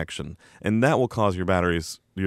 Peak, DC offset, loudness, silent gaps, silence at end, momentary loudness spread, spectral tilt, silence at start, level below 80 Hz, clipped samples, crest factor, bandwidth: -8 dBFS; under 0.1%; -24 LUFS; none; 0 s; 14 LU; -6 dB/octave; 0 s; -48 dBFS; under 0.1%; 18 dB; 15 kHz